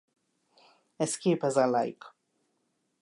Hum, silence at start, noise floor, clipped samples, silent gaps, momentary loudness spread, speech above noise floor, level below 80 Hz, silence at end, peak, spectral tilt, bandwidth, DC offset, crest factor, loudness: none; 1 s; -77 dBFS; under 0.1%; none; 10 LU; 49 dB; -82 dBFS; 0.9 s; -12 dBFS; -5 dB/octave; 11.5 kHz; under 0.1%; 20 dB; -28 LUFS